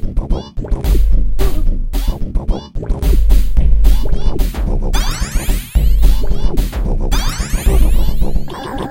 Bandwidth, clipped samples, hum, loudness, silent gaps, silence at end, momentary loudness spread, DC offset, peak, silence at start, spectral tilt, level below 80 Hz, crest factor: 16.5 kHz; 0.2%; none; -18 LUFS; none; 0 s; 8 LU; under 0.1%; 0 dBFS; 0 s; -5.5 dB/octave; -12 dBFS; 12 dB